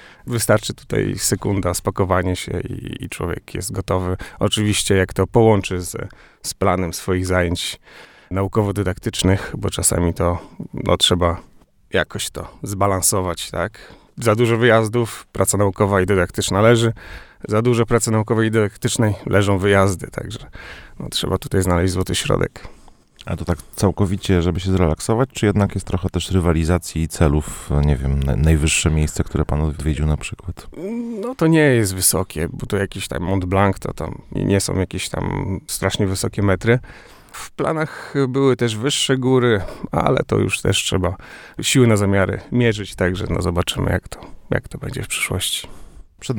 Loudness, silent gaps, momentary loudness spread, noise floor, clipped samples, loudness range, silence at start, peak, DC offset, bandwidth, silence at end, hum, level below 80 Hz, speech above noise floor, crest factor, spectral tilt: -19 LUFS; none; 13 LU; -45 dBFS; under 0.1%; 4 LU; 0 s; 0 dBFS; under 0.1%; 19.5 kHz; 0 s; none; -32 dBFS; 26 dB; 18 dB; -5 dB/octave